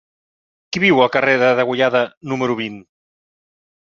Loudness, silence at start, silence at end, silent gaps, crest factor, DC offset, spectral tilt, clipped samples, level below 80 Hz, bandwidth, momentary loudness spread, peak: -16 LUFS; 0.7 s; 1.15 s; 2.17-2.21 s; 18 dB; under 0.1%; -5.5 dB/octave; under 0.1%; -60 dBFS; 7.2 kHz; 10 LU; -2 dBFS